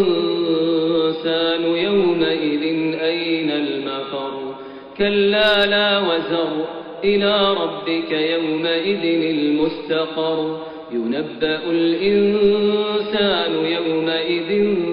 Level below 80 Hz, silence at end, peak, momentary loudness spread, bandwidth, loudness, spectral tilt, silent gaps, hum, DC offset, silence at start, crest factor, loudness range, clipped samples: -54 dBFS; 0 s; -6 dBFS; 9 LU; 5.4 kHz; -19 LUFS; -2.5 dB/octave; none; none; under 0.1%; 0 s; 12 dB; 3 LU; under 0.1%